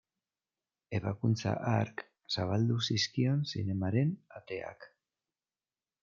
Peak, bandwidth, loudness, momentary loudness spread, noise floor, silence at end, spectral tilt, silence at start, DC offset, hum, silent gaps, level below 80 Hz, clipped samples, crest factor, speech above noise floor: -16 dBFS; 7.4 kHz; -33 LUFS; 11 LU; under -90 dBFS; 1.15 s; -6 dB/octave; 0.9 s; under 0.1%; none; none; -72 dBFS; under 0.1%; 18 dB; over 58 dB